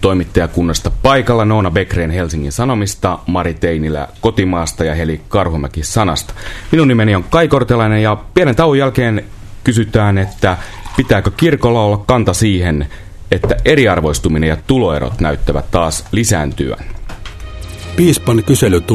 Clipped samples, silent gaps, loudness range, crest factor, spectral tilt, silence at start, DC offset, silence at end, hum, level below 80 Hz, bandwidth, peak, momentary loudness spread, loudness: 0.1%; none; 4 LU; 12 dB; -5.5 dB/octave; 0 s; under 0.1%; 0 s; none; -26 dBFS; 14 kHz; 0 dBFS; 9 LU; -14 LUFS